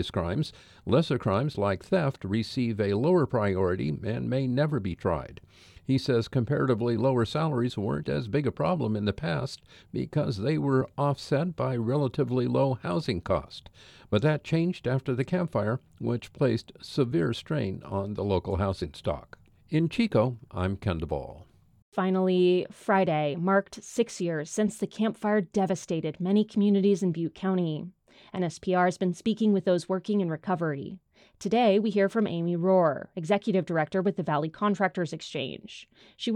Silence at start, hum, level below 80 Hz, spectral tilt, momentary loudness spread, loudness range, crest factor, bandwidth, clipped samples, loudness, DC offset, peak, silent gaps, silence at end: 0 s; none; -56 dBFS; -7 dB/octave; 10 LU; 3 LU; 18 dB; 12 kHz; under 0.1%; -28 LUFS; under 0.1%; -10 dBFS; 21.82-21.92 s; 0 s